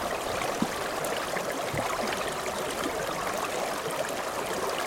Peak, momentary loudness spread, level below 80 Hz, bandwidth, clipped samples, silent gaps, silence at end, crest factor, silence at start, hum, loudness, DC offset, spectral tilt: -12 dBFS; 2 LU; -54 dBFS; 18 kHz; under 0.1%; none; 0 s; 18 dB; 0 s; none; -30 LUFS; under 0.1%; -3 dB/octave